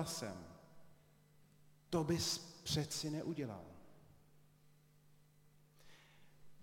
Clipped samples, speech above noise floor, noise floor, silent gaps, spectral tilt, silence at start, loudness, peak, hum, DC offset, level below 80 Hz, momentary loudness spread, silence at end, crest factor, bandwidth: under 0.1%; 28 dB; -69 dBFS; none; -4 dB/octave; 0 s; -41 LUFS; -24 dBFS; none; under 0.1%; -68 dBFS; 22 LU; 0 s; 22 dB; 16.5 kHz